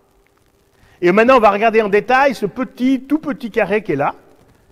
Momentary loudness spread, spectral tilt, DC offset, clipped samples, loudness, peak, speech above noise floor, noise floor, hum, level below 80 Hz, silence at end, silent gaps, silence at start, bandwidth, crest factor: 10 LU; -6.5 dB/octave; under 0.1%; under 0.1%; -15 LUFS; 0 dBFS; 42 dB; -56 dBFS; none; -50 dBFS; 0.6 s; none; 1 s; 14.5 kHz; 16 dB